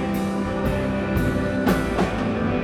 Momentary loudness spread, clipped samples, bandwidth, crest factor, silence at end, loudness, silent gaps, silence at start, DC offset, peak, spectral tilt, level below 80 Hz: 3 LU; under 0.1%; 17 kHz; 14 dB; 0 s; -23 LUFS; none; 0 s; under 0.1%; -8 dBFS; -7 dB/octave; -34 dBFS